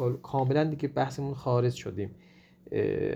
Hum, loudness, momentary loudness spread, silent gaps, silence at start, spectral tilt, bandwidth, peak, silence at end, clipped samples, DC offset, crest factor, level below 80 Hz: none; -30 LUFS; 9 LU; none; 0 s; -7.5 dB/octave; 9.6 kHz; -12 dBFS; 0 s; under 0.1%; under 0.1%; 16 dB; -60 dBFS